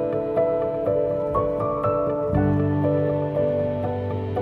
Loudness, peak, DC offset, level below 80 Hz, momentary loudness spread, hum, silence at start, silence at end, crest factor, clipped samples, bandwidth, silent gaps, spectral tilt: -23 LUFS; -8 dBFS; under 0.1%; -44 dBFS; 4 LU; none; 0 s; 0 s; 14 dB; under 0.1%; 4.7 kHz; none; -10.5 dB/octave